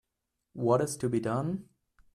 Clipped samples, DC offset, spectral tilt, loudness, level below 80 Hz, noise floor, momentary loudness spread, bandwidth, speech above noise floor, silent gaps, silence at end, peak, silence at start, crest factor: under 0.1%; under 0.1%; -6.5 dB/octave; -31 LUFS; -66 dBFS; -84 dBFS; 11 LU; 14 kHz; 55 dB; none; 0.55 s; -12 dBFS; 0.55 s; 20 dB